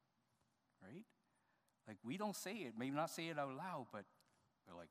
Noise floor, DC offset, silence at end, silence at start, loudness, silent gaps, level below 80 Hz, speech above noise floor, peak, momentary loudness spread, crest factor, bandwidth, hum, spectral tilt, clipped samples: -83 dBFS; under 0.1%; 0.05 s; 0.8 s; -47 LUFS; none; under -90 dBFS; 36 dB; -28 dBFS; 18 LU; 22 dB; 15 kHz; none; -4.5 dB/octave; under 0.1%